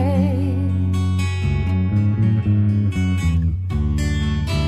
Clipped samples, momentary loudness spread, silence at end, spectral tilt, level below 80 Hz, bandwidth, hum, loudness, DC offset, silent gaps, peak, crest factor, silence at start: under 0.1%; 3 LU; 0 s; -7.5 dB/octave; -28 dBFS; 11 kHz; none; -20 LUFS; under 0.1%; none; -8 dBFS; 10 dB; 0 s